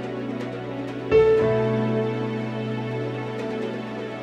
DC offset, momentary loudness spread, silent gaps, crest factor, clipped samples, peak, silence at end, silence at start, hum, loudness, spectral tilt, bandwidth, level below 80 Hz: under 0.1%; 12 LU; none; 18 dB; under 0.1%; -6 dBFS; 0 s; 0 s; none; -25 LUFS; -8 dB/octave; 8 kHz; -50 dBFS